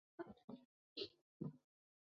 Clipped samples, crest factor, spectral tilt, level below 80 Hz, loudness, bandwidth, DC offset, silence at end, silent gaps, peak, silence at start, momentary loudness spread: under 0.1%; 22 dB; -4.5 dB/octave; -86 dBFS; -55 LUFS; 7 kHz; under 0.1%; 0.6 s; 0.44-0.48 s, 0.65-0.96 s, 1.21-1.40 s; -34 dBFS; 0.2 s; 9 LU